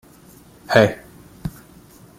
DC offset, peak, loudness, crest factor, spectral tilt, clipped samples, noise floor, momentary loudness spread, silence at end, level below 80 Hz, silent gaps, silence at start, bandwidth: under 0.1%; -2 dBFS; -17 LUFS; 22 dB; -6 dB/octave; under 0.1%; -47 dBFS; 18 LU; 0.7 s; -50 dBFS; none; 0.7 s; 16.5 kHz